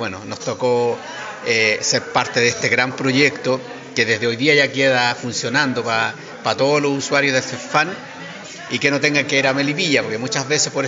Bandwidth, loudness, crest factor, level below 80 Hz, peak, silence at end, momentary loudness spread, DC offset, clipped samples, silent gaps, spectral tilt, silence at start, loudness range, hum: 7.8 kHz; -18 LUFS; 18 dB; -62 dBFS; -2 dBFS; 0 s; 11 LU; under 0.1%; under 0.1%; none; -2.5 dB/octave; 0 s; 2 LU; none